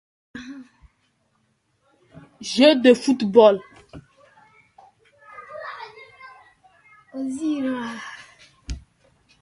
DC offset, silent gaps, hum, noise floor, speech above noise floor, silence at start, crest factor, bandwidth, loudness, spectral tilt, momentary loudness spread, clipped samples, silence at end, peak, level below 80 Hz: under 0.1%; none; none; -68 dBFS; 50 dB; 0.35 s; 24 dB; 11.5 kHz; -19 LUFS; -4.5 dB/octave; 28 LU; under 0.1%; 0.65 s; 0 dBFS; -50 dBFS